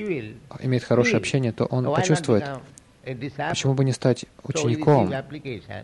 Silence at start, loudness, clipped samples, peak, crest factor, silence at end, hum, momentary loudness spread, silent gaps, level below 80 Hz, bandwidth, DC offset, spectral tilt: 0 s; -23 LUFS; under 0.1%; -6 dBFS; 18 dB; 0 s; none; 15 LU; none; -56 dBFS; 11 kHz; under 0.1%; -6 dB/octave